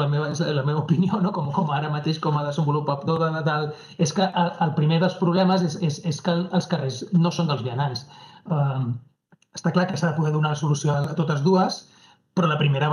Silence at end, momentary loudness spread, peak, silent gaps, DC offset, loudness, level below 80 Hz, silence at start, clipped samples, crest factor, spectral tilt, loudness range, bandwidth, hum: 0 s; 6 LU; -6 dBFS; none; under 0.1%; -23 LUFS; -70 dBFS; 0 s; under 0.1%; 16 dB; -6.5 dB/octave; 3 LU; 10.5 kHz; none